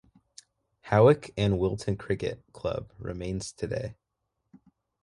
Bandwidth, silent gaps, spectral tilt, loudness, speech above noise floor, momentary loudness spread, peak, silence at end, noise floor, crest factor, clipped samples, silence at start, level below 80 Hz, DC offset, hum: 11.5 kHz; none; -6.5 dB/octave; -28 LUFS; 54 dB; 15 LU; -8 dBFS; 1.1 s; -81 dBFS; 22 dB; under 0.1%; 0.85 s; -50 dBFS; under 0.1%; none